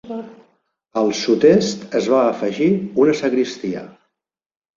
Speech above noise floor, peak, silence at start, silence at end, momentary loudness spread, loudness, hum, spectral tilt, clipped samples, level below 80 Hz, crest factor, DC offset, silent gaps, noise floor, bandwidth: 63 dB; -2 dBFS; 0.05 s; 0.9 s; 14 LU; -18 LUFS; none; -5.5 dB/octave; under 0.1%; -60 dBFS; 16 dB; under 0.1%; none; -80 dBFS; 7.8 kHz